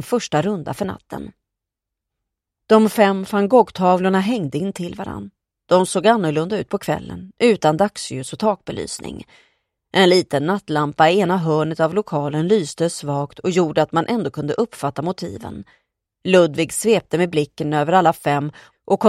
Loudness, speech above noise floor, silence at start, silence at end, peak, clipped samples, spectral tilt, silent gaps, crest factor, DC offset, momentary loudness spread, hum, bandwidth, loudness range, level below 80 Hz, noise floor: -19 LUFS; 65 dB; 0 s; 0 s; 0 dBFS; under 0.1%; -5.5 dB/octave; none; 18 dB; under 0.1%; 14 LU; none; 15.5 kHz; 3 LU; -56 dBFS; -84 dBFS